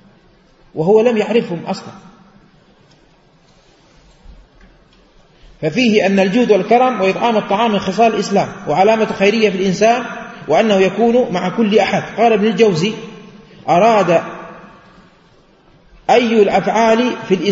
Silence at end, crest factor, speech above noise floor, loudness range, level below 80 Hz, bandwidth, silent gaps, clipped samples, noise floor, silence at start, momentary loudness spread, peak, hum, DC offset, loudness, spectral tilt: 0 s; 16 dB; 37 dB; 6 LU; -52 dBFS; 8 kHz; none; under 0.1%; -50 dBFS; 0.75 s; 12 LU; 0 dBFS; none; under 0.1%; -14 LUFS; -5.5 dB/octave